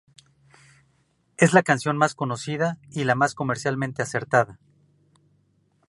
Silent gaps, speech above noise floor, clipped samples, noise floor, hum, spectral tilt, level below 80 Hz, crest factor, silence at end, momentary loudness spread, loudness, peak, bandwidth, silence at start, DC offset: none; 44 dB; under 0.1%; -66 dBFS; none; -5.5 dB/octave; -66 dBFS; 22 dB; 1.35 s; 10 LU; -23 LUFS; -2 dBFS; 11.5 kHz; 1.4 s; under 0.1%